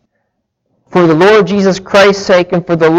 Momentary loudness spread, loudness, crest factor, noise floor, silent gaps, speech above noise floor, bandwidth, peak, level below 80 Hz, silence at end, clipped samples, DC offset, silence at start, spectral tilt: 5 LU; -9 LUFS; 10 dB; -67 dBFS; none; 59 dB; 11 kHz; 0 dBFS; -46 dBFS; 0 s; under 0.1%; under 0.1%; 0.9 s; -5.5 dB/octave